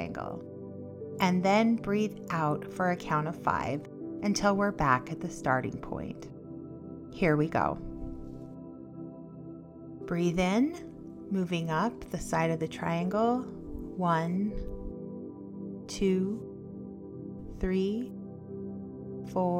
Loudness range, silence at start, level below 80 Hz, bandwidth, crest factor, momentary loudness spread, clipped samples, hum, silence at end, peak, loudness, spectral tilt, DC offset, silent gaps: 5 LU; 0 s; -50 dBFS; 15.5 kHz; 22 dB; 17 LU; under 0.1%; none; 0 s; -10 dBFS; -31 LUFS; -6.5 dB/octave; under 0.1%; none